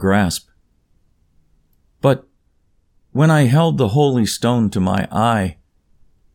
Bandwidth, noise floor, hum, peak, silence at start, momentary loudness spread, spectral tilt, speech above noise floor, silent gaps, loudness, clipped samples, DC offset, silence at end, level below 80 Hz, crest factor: 17.5 kHz; -60 dBFS; none; -2 dBFS; 0 s; 9 LU; -6.5 dB/octave; 45 dB; none; -17 LUFS; under 0.1%; under 0.1%; 0.8 s; -48 dBFS; 16 dB